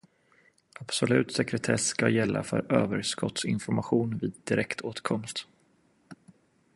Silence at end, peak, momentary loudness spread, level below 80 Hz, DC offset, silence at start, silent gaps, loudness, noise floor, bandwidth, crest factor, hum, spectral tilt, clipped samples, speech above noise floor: 0.6 s; -6 dBFS; 8 LU; -62 dBFS; under 0.1%; 0.8 s; none; -28 LUFS; -66 dBFS; 11.5 kHz; 24 dB; none; -4.5 dB/octave; under 0.1%; 38 dB